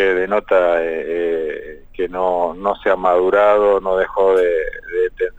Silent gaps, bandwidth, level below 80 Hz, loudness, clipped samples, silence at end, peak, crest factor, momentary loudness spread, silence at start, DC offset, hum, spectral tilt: none; 8 kHz; -42 dBFS; -17 LUFS; under 0.1%; 0.05 s; -2 dBFS; 14 dB; 10 LU; 0 s; under 0.1%; none; -6 dB/octave